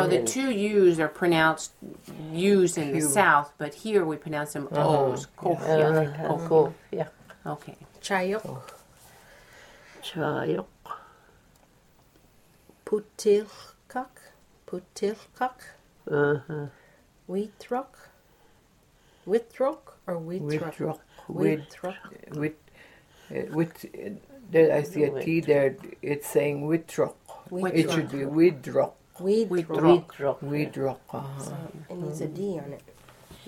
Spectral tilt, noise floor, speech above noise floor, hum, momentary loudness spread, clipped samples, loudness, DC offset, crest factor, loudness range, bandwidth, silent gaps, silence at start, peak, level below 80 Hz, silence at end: -5.5 dB/octave; -61 dBFS; 35 dB; none; 18 LU; under 0.1%; -27 LUFS; under 0.1%; 22 dB; 10 LU; 16.5 kHz; none; 0 s; -6 dBFS; -64 dBFS; 0.1 s